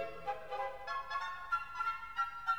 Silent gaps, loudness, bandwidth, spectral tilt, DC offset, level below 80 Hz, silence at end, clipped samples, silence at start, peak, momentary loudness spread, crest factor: none; -39 LUFS; over 20 kHz; -2.5 dB/octave; 0.2%; -66 dBFS; 0 s; under 0.1%; 0 s; -24 dBFS; 4 LU; 16 dB